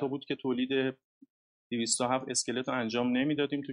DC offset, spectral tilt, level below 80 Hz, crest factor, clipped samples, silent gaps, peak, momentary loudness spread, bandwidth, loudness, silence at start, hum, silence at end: under 0.1%; -3.5 dB/octave; -74 dBFS; 18 dB; under 0.1%; 1.04-1.21 s, 1.30-1.70 s; -14 dBFS; 6 LU; 11.5 kHz; -31 LUFS; 0 s; none; 0 s